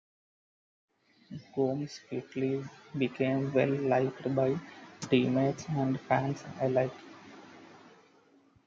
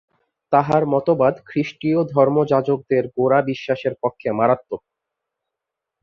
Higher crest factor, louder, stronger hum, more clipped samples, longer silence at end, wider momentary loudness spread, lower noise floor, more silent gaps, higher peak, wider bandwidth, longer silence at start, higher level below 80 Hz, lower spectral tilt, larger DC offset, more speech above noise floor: about the same, 22 dB vs 18 dB; second, -31 LUFS vs -19 LUFS; neither; neither; second, 0.9 s vs 1.25 s; first, 20 LU vs 7 LU; second, -64 dBFS vs -84 dBFS; neither; second, -12 dBFS vs -2 dBFS; first, 7.6 kHz vs 6.8 kHz; first, 1.3 s vs 0.5 s; second, -70 dBFS vs -60 dBFS; second, -7 dB/octave vs -8.5 dB/octave; neither; second, 33 dB vs 65 dB